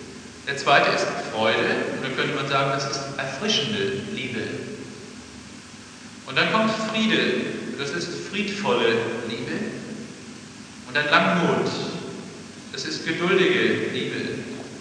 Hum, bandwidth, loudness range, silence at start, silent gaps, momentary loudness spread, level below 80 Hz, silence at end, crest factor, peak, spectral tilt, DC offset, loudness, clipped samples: none; 10.5 kHz; 4 LU; 0 s; none; 20 LU; -62 dBFS; 0 s; 24 dB; 0 dBFS; -4 dB/octave; under 0.1%; -23 LUFS; under 0.1%